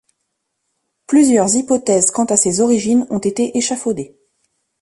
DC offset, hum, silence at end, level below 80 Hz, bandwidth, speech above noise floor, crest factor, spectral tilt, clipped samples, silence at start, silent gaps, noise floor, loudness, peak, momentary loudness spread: under 0.1%; none; 0.75 s; -56 dBFS; 11.5 kHz; 58 dB; 16 dB; -4 dB/octave; under 0.1%; 1.1 s; none; -73 dBFS; -15 LUFS; 0 dBFS; 9 LU